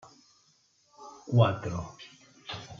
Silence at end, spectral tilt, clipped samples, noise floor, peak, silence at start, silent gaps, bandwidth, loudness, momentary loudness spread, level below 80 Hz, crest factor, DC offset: 0.05 s; -7 dB/octave; under 0.1%; -67 dBFS; -8 dBFS; 1 s; none; 7.2 kHz; -29 LUFS; 25 LU; -62 dBFS; 24 dB; under 0.1%